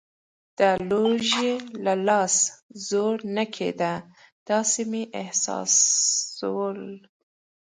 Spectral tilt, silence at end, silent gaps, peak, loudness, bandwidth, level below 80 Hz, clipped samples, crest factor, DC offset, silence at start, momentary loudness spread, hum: -2 dB/octave; 0.75 s; 2.62-2.69 s, 4.32-4.46 s; -6 dBFS; -23 LUFS; 10 kHz; -68 dBFS; under 0.1%; 18 dB; under 0.1%; 0.6 s; 11 LU; none